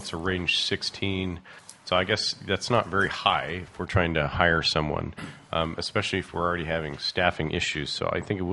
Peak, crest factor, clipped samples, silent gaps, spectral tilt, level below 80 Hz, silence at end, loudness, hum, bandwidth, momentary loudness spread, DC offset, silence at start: -4 dBFS; 24 dB; under 0.1%; none; -4.5 dB/octave; -50 dBFS; 0 s; -26 LUFS; none; 11.5 kHz; 9 LU; under 0.1%; 0 s